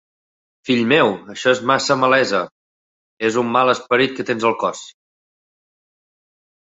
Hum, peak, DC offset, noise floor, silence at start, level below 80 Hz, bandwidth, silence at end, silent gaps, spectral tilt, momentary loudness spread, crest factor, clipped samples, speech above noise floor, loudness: none; 0 dBFS; under 0.1%; under -90 dBFS; 0.65 s; -64 dBFS; 8 kHz; 1.75 s; 2.51-3.17 s; -4 dB/octave; 8 LU; 20 dB; under 0.1%; over 73 dB; -17 LUFS